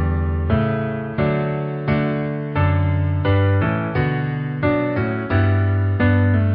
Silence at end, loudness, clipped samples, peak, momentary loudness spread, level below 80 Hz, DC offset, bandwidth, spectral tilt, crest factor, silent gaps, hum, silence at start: 0 s; -20 LUFS; under 0.1%; -4 dBFS; 6 LU; -30 dBFS; under 0.1%; 4.9 kHz; -13 dB/octave; 14 dB; none; none; 0 s